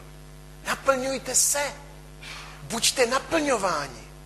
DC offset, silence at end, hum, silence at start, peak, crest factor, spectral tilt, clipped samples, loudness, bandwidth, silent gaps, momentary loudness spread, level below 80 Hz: under 0.1%; 0 s; none; 0 s; -6 dBFS; 22 dB; -1.5 dB/octave; under 0.1%; -24 LUFS; 13 kHz; none; 18 LU; -48 dBFS